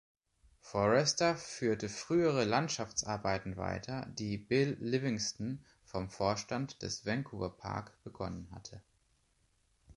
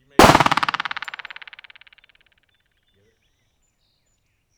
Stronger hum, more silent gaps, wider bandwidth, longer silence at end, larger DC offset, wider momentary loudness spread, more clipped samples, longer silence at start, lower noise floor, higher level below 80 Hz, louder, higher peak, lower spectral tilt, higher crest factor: neither; neither; second, 11.5 kHz vs over 20 kHz; second, 0.05 s vs 3.8 s; neither; second, 13 LU vs 25 LU; neither; first, 0.65 s vs 0.2 s; first, -74 dBFS vs -68 dBFS; second, -60 dBFS vs -44 dBFS; second, -35 LUFS vs -17 LUFS; second, -16 dBFS vs 0 dBFS; about the same, -4.5 dB/octave vs -4 dB/octave; about the same, 20 dB vs 22 dB